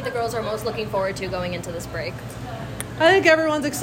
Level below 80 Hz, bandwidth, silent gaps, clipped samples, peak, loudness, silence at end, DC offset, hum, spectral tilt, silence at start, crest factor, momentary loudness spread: -46 dBFS; 16.5 kHz; none; under 0.1%; -4 dBFS; -22 LUFS; 0 s; under 0.1%; none; -4.5 dB/octave; 0 s; 18 dB; 17 LU